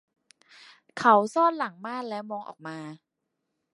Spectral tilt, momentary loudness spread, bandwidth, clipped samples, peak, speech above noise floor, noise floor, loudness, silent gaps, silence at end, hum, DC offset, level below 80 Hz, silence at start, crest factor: -5 dB/octave; 20 LU; 11.5 kHz; under 0.1%; -6 dBFS; 56 dB; -81 dBFS; -25 LUFS; none; 0.8 s; none; under 0.1%; -78 dBFS; 0.95 s; 22 dB